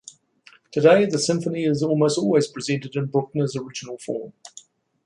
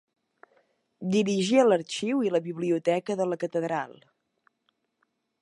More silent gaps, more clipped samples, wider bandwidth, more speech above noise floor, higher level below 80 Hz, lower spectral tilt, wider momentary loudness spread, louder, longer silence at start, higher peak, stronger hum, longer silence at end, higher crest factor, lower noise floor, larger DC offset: neither; neither; about the same, 11.5 kHz vs 11 kHz; second, 33 dB vs 50 dB; first, -66 dBFS vs -78 dBFS; about the same, -5.5 dB/octave vs -5.5 dB/octave; first, 16 LU vs 10 LU; first, -22 LUFS vs -26 LUFS; second, 0.75 s vs 1 s; first, -2 dBFS vs -8 dBFS; neither; second, 0.6 s vs 1.5 s; about the same, 20 dB vs 20 dB; second, -54 dBFS vs -76 dBFS; neither